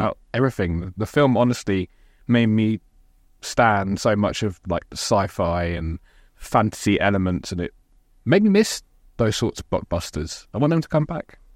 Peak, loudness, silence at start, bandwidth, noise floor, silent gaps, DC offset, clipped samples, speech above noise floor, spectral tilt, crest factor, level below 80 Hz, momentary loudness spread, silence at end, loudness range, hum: -4 dBFS; -22 LUFS; 0 s; 16 kHz; -55 dBFS; none; under 0.1%; under 0.1%; 34 dB; -6 dB/octave; 18 dB; -44 dBFS; 12 LU; 0.35 s; 2 LU; none